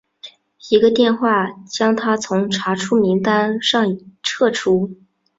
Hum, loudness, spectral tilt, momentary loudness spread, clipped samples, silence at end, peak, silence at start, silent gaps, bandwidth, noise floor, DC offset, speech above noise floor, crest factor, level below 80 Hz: none; -17 LUFS; -4.5 dB/octave; 7 LU; under 0.1%; 0.45 s; -2 dBFS; 0.25 s; none; 7.8 kHz; -43 dBFS; under 0.1%; 26 dB; 16 dB; -60 dBFS